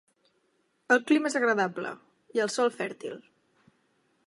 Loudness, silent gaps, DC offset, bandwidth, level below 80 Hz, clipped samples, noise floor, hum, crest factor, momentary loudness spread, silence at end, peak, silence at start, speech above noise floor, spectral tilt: -27 LUFS; none; under 0.1%; 11.5 kHz; -86 dBFS; under 0.1%; -72 dBFS; none; 22 dB; 17 LU; 1.05 s; -8 dBFS; 0.9 s; 45 dB; -4 dB/octave